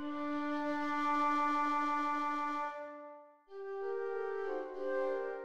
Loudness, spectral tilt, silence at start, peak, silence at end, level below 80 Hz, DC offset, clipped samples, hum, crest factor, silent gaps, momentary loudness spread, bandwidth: -36 LUFS; -4.5 dB/octave; 0 s; -24 dBFS; 0 s; -76 dBFS; 0.3%; under 0.1%; none; 12 dB; none; 14 LU; 12.5 kHz